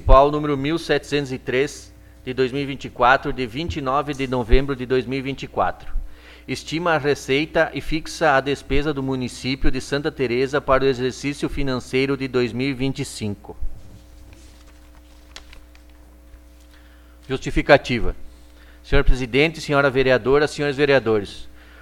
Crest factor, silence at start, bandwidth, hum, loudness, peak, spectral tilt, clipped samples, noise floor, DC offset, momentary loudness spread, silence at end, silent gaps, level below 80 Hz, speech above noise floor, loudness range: 20 dB; 0 s; 13 kHz; none; -21 LUFS; 0 dBFS; -5.5 dB/octave; under 0.1%; -46 dBFS; under 0.1%; 14 LU; 0 s; none; -28 dBFS; 26 dB; 7 LU